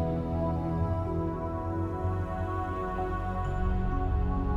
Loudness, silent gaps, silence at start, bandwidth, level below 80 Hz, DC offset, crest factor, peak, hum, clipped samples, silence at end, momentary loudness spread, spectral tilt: -32 LUFS; none; 0 s; 7.4 kHz; -34 dBFS; under 0.1%; 12 dB; -18 dBFS; none; under 0.1%; 0 s; 2 LU; -9.5 dB/octave